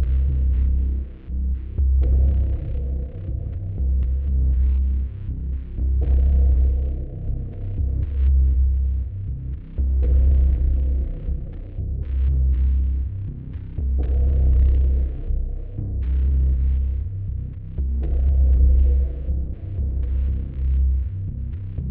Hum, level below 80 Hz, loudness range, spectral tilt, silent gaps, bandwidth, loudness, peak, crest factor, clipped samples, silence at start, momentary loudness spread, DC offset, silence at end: none; -20 dBFS; 3 LU; -12 dB/octave; none; 0.8 kHz; -23 LUFS; -8 dBFS; 12 dB; under 0.1%; 0 s; 11 LU; under 0.1%; 0 s